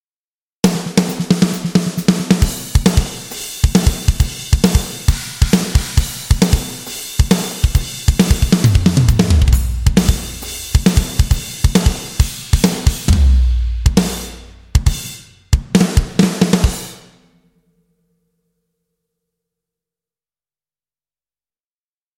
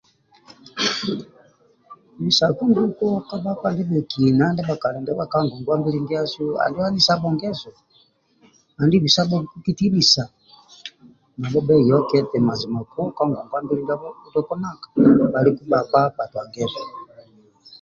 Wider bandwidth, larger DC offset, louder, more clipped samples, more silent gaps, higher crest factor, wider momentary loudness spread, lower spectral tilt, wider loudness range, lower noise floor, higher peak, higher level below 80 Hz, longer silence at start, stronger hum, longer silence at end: first, 17 kHz vs 7.4 kHz; neither; first, -16 LUFS vs -20 LUFS; neither; neither; about the same, 16 dB vs 18 dB; second, 8 LU vs 13 LU; about the same, -5.5 dB/octave vs -5.5 dB/octave; about the same, 4 LU vs 3 LU; first, under -90 dBFS vs -59 dBFS; about the same, 0 dBFS vs -2 dBFS; first, -20 dBFS vs -56 dBFS; about the same, 0.65 s vs 0.75 s; neither; first, 5.2 s vs 0.05 s